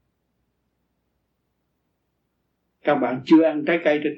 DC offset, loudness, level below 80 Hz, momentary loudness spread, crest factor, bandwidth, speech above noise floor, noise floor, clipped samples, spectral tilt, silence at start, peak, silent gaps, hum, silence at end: under 0.1%; -20 LUFS; -74 dBFS; 7 LU; 18 dB; 6.2 kHz; 55 dB; -74 dBFS; under 0.1%; -7.5 dB/octave; 2.85 s; -6 dBFS; none; none; 0 s